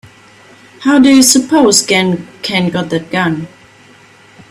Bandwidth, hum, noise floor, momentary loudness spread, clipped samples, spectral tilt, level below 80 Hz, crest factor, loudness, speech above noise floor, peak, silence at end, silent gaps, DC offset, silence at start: 15 kHz; none; -42 dBFS; 12 LU; under 0.1%; -3.5 dB/octave; -52 dBFS; 12 dB; -10 LUFS; 31 dB; 0 dBFS; 1.05 s; none; under 0.1%; 0.8 s